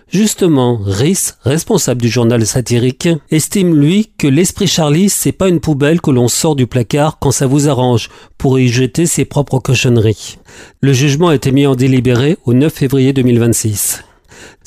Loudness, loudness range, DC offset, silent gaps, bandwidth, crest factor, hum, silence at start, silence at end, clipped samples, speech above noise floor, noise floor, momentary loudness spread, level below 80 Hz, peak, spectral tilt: -12 LUFS; 2 LU; under 0.1%; none; 16 kHz; 10 dB; none; 0.15 s; 0.2 s; under 0.1%; 27 dB; -38 dBFS; 4 LU; -38 dBFS; -2 dBFS; -5.5 dB/octave